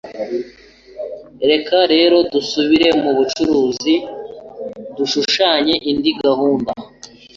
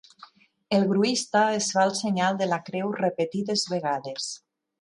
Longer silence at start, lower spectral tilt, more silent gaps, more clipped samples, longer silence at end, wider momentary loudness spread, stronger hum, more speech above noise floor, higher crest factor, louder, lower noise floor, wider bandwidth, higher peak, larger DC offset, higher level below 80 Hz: second, 0.05 s vs 0.2 s; about the same, -4 dB/octave vs -4 dB/octave; neither; neither; second, 0.3 s vs 0.45 s; first, 18 LU vs 8 LU; neither; about the same, 26 dB vs 28 dB; about the same, 16 dB vs 18 dB; first, -15 LUFS vs -25 LUFS; second, -41 dBFS vs -53 dBFS; second, 7.6 kHz vs 11.5 kHz; first, -2 dBFS vs -8 dBFS; neither; first, -52 dBFS vs -72 dBFS